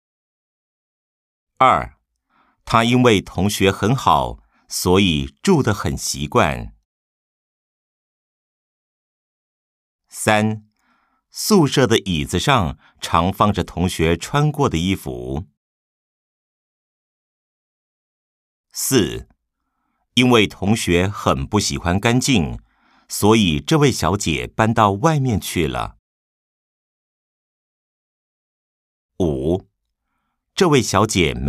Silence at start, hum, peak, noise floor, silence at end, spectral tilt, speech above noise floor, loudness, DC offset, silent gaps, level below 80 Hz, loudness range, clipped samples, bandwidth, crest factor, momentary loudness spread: 1.6 s; none; 0 dBFS; -74 dBFS; 0 s; -5 dB/octave; 57 dB; -18 LUFS; under 0.1%; 6.85-9.99 s, 15.57-18.64 s, 25.99-29.09 s; -40 dBFS; 11 LU; under 0.1%; 15.5 kHz; 20 dB; 12 LU